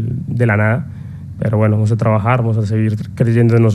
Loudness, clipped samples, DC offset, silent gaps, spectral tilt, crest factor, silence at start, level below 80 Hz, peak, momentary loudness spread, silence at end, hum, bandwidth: -15 LUFS; under 0.1%; under 0.1%; none; -9 dB/octave; 14 dB; 0 s; -44 dBFS; 0 dBFS; 9 LU; 0 s; none; 8.4 kHz